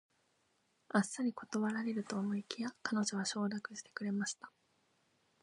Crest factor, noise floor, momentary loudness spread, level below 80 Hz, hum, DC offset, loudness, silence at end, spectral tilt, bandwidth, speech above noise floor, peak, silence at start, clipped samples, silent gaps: 22 dB; -78 dBFS; 8 LU; -86 dBFS; none; under 0.1%; -38 LUFS; 0.95 s; -4 dB/octave; 11 kHz; 40 dB; -18 dBFS; 0.95 s; under 0.1%; none